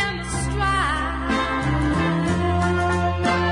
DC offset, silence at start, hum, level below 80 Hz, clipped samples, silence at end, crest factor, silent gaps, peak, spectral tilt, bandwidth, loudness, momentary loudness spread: under 0.1%; 0 s; none; -32 dBFS; under 0.1%; 0 s; 14 dB; none; -8 dBFS; -5.5 dB/octave; 11 kHz; -22 LUFS; 3 LU